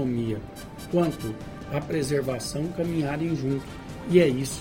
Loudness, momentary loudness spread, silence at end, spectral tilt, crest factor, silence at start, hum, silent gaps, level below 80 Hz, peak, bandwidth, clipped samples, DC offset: -27 LUFS; 16 LU; 0 s; -6 dB/octave; 20 dB; 0 s; none; none; -48 dBFS; -6 dBFS; 16.5 kHz; under 0.1%; under 0.1%